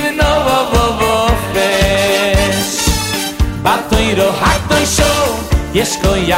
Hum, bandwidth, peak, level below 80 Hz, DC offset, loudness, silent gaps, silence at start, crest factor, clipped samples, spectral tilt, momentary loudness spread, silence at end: none; 16.5 kHz; -2 dBFS; -22 dBFS; under 0.1%; -13 LUFS; none; 0 s; 12 dB; under 0.1%; -4 dB/octave; 4 LU; 0 s